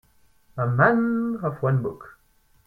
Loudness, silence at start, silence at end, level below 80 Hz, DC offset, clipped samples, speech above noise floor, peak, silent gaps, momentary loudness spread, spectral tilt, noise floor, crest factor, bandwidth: -23 LUFS; 0.55 s; 0.55 s; -58 dBFS; under 0.1%; under 0.1%; 39 dB; -6 dBFS; none; 16 LU; -10.5 dB/octave; -61 dBFS; 20 dB; 4.5 kHz